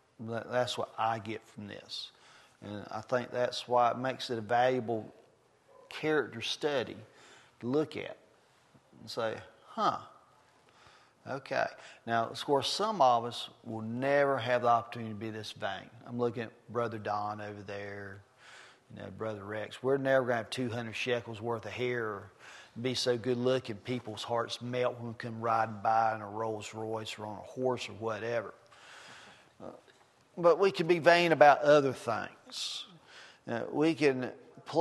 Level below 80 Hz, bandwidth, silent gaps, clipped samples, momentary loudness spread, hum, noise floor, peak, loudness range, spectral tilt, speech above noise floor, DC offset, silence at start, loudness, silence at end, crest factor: -78 dBFS; 12.5 kHz; none; under 0.1%; 20 LU; none; -65 dBFS; -6 dBFS; 11 LU; -5 dB/octave; 33 dB; under 0.1%; 0.2 s; -32 LUFS; 0 s; 26 dB